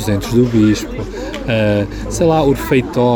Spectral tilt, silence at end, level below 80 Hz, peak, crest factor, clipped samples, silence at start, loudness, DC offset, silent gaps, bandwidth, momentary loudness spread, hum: -6.5 dB/octave; 0 s; -30 dBFS; -2 dBFS; 12 dB; under 0.1%; 0 s; -15 LUFS; under 0.1%; none; over 20 kHz; 11 LU; none